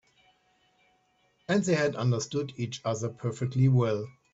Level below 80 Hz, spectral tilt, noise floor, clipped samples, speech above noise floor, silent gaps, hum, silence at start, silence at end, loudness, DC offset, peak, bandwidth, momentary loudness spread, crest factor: -66 dBFS; -6.5 dB/octave; -69 dBFS; under 0.1%; 42 dB; none; none; 1.5 s; 0.25 s; -28 LUFS; under 0.1%; -12 dBFS; 8 kHz; 10 LU; 18 dB